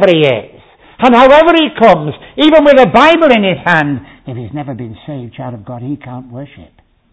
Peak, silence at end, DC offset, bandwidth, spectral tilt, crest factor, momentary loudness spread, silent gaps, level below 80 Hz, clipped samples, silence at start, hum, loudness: 0 dBFS; 0.65 s; under 0.1%; 8 kHz; -6.5 dB/octave; 10 dB; 20 LU; none; -42 dBFS; 1%; 0 s; none; -8 LUFS